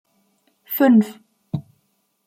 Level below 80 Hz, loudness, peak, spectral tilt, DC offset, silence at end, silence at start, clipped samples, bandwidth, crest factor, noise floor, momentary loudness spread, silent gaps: -66 dBFS; -19 LUFS; -4 dBFS; -7.5 dB/octave; under 0.1%; 0.65 s; 0.7 s; under 0.1%; 15.5 kHz; 16 dB; -68 dBFS; 16 LU; none